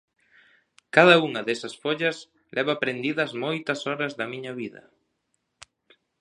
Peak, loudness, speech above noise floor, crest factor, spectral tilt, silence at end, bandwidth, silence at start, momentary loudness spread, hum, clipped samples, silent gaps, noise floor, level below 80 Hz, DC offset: 0 dBFS; -24 LUFS; 52 dB; 26 dB; -5 dB/octave; 1.5 s; 11 kHz; 0.95 s; 17 LU; none; under 0.1%; none; -76 dBFS; -74 dBFS; under 0.1%